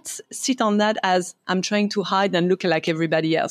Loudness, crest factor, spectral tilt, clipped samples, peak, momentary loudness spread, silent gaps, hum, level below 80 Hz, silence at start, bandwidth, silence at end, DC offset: -21 LUFS; 16 dB; -4.5 dB/octave; under 0.1%; -6 dBFS; 5 LU; none; none; -74 dBFS; 0.05 s; 14.5 kHz; 0 s; under 0.1%